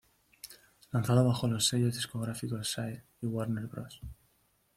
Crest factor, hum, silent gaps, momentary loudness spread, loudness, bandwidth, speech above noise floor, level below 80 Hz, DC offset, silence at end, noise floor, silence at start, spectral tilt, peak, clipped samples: 20 dB; none; none; 22 LU; -32 LUFS; 15.5 kHz; 40 dB; -60 dBFS; under 0.1%; 0.65 s; -72 dBFS; 0.45 s; -5 dB/octave; -14 dBFS; under 0.1%